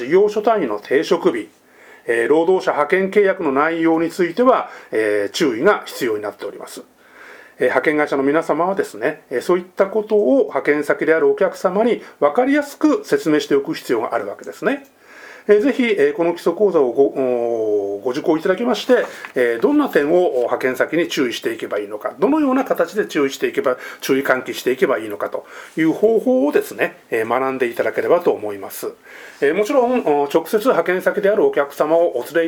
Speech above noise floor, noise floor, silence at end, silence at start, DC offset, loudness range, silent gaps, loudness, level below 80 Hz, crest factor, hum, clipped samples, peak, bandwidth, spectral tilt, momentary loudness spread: 25 dB; -42 dBFS; 0 s; 0 s; under 0.1%; 3 LU; none; -18 LUFS; -66 dBFS; 18 dB; none; under 0.1%; 0 dBFS; 19.5 kHz; -5 dB/octave; 9 LU